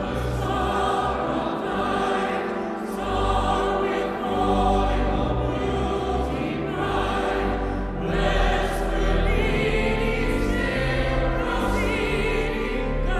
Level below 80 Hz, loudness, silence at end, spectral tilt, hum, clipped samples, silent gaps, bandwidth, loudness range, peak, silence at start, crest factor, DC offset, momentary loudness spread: -28 dBFS; -24 LUFS; 0 s; -6 dB/octave; none; under 0.1%; none; 13.5 kHz; 1 LU; -8 dBFS; 0 s; 14 dB; under 0.1%; 4 LU